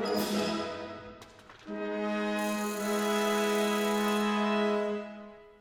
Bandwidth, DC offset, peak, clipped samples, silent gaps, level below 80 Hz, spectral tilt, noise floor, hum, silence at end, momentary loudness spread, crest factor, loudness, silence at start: 19 kHz; under 0.1%; -16 dBFS; under 0.1%; none; -68 dBFS; -4.5 dB/octave; -52 dBFS; none; 0.1 s; 17 LU; 14 dB; -30 LUFS; 0 s